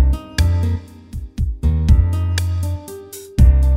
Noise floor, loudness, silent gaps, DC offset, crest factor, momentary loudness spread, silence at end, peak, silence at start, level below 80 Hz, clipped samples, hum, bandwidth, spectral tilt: -34 dBFS; -18 LUFS; none; under 0.1%; 14 dB; 17 LU; 0 s; -2 dBFS; 0 s; -18 dBFS; under 0.1%; none; 15 kHz; -6.5 dB/octave